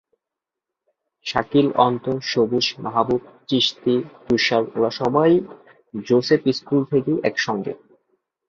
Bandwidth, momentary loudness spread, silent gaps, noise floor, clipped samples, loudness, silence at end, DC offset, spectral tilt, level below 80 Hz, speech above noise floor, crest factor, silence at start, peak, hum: 7.4 kHz; 9 LU; none; -86 dBFS; under 0.1%; -20 LUFS; 0.75 s; under 0.1%; -5.5 dB/octave; -58 dBFS; 66 dB; 20 dB; 1.25 s; -2 dBFS; none